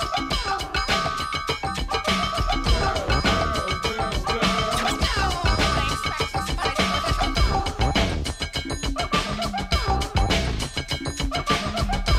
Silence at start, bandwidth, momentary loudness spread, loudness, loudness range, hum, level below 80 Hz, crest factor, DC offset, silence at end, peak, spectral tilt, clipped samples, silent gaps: 0 s; 16 kHz; 5 LU; -24 LUFS; 2 LU; none; -30 dBFS; 16 dB; under 0.1%; 0 s; -8 dBFS; -4 dB/octave; under 0.1%; none